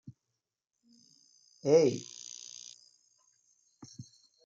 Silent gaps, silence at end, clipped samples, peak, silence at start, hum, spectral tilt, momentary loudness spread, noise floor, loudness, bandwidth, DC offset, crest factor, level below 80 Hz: none; 0.45 s; under 0.1%; -12 dBFS; 1.65 s; none; -5 dB/octave; 27 LU; -87 dBFS; -30 LUFS; 7.8 kHz; under 0.1%; 22 dB; -82 dBFS